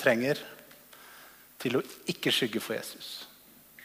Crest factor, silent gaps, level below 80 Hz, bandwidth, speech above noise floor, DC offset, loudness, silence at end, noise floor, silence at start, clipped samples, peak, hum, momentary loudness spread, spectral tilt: 24 dB; none; -74 dBFS; 15.5 kHz; 25 dB; under 0.1%; -31 LUFS; 0 s; -55 dBFS; 0 s; under 0.1%; -8 dBFS; none; 23 LU; -4 dB/octave